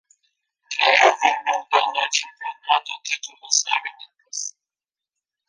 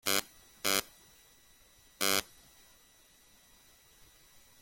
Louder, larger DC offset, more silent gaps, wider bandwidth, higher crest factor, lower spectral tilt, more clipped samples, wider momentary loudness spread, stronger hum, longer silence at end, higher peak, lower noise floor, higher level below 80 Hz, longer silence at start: first, -20 LUFS vs -32 LUFS; neither; neither; second, 10.5 kHz vs 17 kHz; second, 22 dB vs 30 dB; second, 3 dB/octave vs -0.5 dB/octave; neither; second, 17 LU vs 25 LU; neither; second, 1 s vs 2.4 s; first, 0 dBFS vs -8 dBFS; first, under -90 dBFS vs -63 dBFS; second, -80 dBFS vs -68 dBFS; first, 0.7 s vs 0.05 s